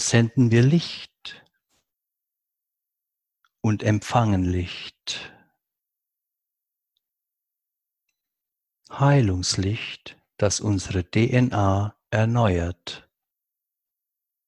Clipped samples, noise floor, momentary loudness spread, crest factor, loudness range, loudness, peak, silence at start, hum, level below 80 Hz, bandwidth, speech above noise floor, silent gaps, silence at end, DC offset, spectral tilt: under 0.1%; -85 dBFS; 18 LU; 22 dB; 8 LU; -23 LUFS; -2 dBFS; 0 s; none; -42 dBFS; 11.5 kHz; 64 dB; none; 1.5 s; under 0.1%; -5.5 dB/octave